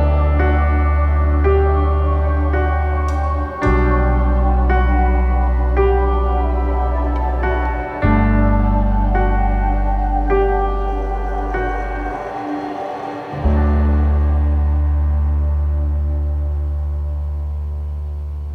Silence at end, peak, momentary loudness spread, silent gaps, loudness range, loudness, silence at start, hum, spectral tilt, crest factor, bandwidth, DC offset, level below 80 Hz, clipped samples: 0 s; -2 dBFS; 9 LU; none; 4 LU; -18 LUFS; 0 s; none; -9.5 dB/octave; 14 dB; 4.4 kHz; under 0.1%; -18 dBFS; under 0.1%